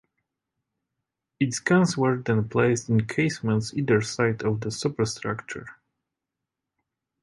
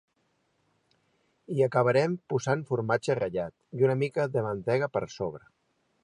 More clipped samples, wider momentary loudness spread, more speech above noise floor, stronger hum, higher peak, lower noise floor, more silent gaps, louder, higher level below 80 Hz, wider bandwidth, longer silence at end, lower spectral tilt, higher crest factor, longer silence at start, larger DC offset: neither; about the same, 9 LU vs 10 LU; first, 62 dB vs 46 dB; neither; about the same, -8 dBFS vs -10 dBFS; first, -86 dBFS vs -73 dBFS; neither; first, -25 LUFS vs -28 LUFS; first, -58 dBFS vs -66 dBFS; about the same, 11.5 kHz vs 11 kHz; first, 1.5 s vs 0.65 s; about the same, -5.5 dB/octave vs -6.5 dB/octave; about the same, 18 dB vs 20 dB; about the same, 1.4 s vs 1.5 s; neither